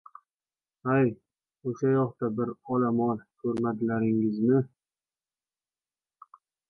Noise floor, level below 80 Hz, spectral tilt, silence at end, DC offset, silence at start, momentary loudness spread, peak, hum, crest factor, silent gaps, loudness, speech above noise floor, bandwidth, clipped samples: under -90 dBFS; -68 dBFS; -10 dB/octave; 2 s; under 0.1%; 0.85 s; 11 LU; -12 dBFS; none; 16 dB; none; -28 LUFS; over 64 dB; 6.4 kHz; under 0.1%